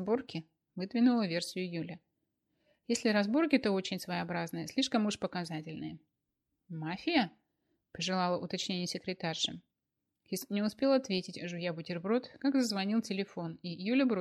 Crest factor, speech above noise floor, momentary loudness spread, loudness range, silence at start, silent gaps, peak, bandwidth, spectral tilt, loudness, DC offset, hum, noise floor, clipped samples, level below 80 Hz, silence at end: 20 dB; 54 dB; 13 LU; 4 LU; 0 s; none; -14 dBFS; 13.5 kHz; -5 dB/octave; -34 LUFS; under 0.1%; none; -87 dBFS; under 0.1%; -74 dBFS; 0 s